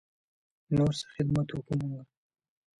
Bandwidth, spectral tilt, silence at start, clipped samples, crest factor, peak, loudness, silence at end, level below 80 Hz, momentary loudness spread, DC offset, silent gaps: 11.5 kHz; -7 dB/octave; 0.7 s; under 0.1%; 16 dB; -16 dBFS; -31 LUFS; 0.75 s; -56 dBFS; 8 LU; under 0.1%; none